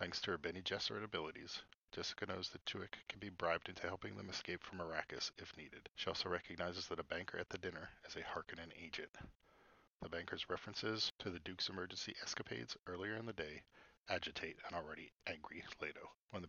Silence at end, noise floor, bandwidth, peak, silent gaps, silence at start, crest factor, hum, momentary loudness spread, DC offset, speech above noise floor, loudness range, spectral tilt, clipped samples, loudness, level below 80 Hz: 0 s; -71 dBFS; 7.2 kHz; -22 dBFS; 1.75-1.88 s, 9.09-9.14 s, 9.36-9.40 s, 9.87-9.98 s, 11.11-11.19 s, 12.79-12.83 s, 14.00-14.04 s, 16.16-16.28 s; 0 s; 26 dB; none; 11 LU; under 0.1%; 24 dB; 4 LU; -2 dB/octave; under 0.1%; -46 LUFS; -72 dBFS